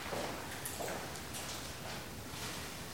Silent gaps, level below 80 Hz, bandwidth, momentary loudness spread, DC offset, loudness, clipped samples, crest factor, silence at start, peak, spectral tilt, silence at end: none; -58 dBFS; 17 kHz; 4 LU; 0.2%; -42 LUFS; under 0.1%; 18 dB; 0 s; -24 dBFS; -3 dB/octave; 0 s